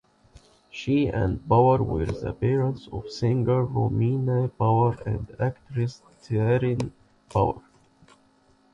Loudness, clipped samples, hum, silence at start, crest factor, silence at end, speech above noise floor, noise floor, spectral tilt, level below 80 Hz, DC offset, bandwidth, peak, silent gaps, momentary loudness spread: -25 LUFS; under 0.1%; none; 0.75 s; 18 dB; 1.15 s; 37 dB; -61 dBFS; -8.5 dB/octave; -44 dBFS; under 0.1%; 7.6 kHz; -8 dBFS; none; 10 LU